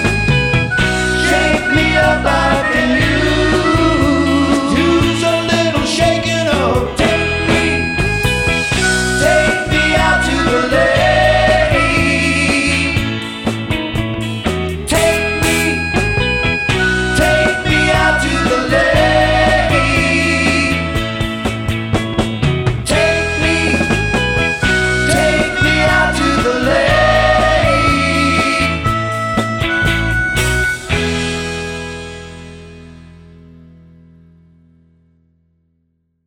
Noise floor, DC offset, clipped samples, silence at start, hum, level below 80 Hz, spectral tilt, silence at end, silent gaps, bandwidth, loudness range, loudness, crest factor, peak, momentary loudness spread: -63 dBFS; under 0.1%; under 0.1%; 0 s; none; -26 dBFS; -4.5 dB/octave; 2.75 s; none; 17 kHz; 4 LU; -13 LUFS; 12 dB; -2 dBFS; 7 LU